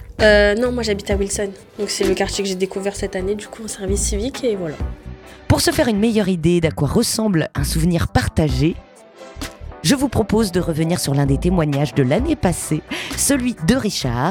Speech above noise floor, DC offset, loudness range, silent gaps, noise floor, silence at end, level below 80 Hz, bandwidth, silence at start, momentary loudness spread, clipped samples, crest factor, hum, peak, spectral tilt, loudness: 22 dB; under 0.1%; 4 LU; none; -40 dBFS; 0 s; -32 dBFS; 19 kHz; 0 s; 11 LU; under 0.1%; 18 dB; none; 0 dBFS; -5 dB/octave; -19 LUFS